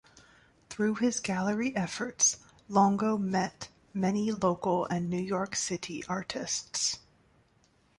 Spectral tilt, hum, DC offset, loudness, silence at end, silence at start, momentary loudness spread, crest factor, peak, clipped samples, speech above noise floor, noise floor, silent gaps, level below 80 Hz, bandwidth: -4 dB/octave; none; under 0.1%; -30 LUFS; 1 s; 0.7 s; 10 LU; 20 dB; -12 dBFS; under 0.1%; 37 dB; -67 dBFS; none; -64 dBFS; 11.5 kHz